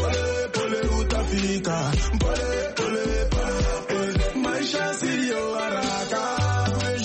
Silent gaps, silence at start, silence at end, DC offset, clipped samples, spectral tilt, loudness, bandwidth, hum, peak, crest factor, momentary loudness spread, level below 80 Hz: none; 0 s; 0 s; under 0.1%; under 0.1%; -4.5 dB/octave; -25 LUFS; 8.8 kHz; none; -12 dBFS; 12 dB; 2 LU; -30 dBFS